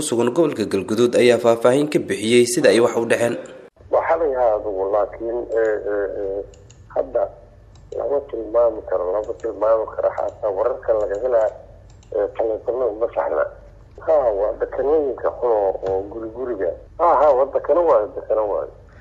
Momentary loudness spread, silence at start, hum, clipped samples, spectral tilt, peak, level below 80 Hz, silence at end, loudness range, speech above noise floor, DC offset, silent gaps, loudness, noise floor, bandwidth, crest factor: 11 LU; 0 s; none; under 0.1%; -4.5 dB/octave; -2 dBFS; -48 dBFS; 0 s; 7 LU; 22 dB; under 0.1%; none; -20 LUFS; -41 dBFS; 14.5 kHz; 18 dB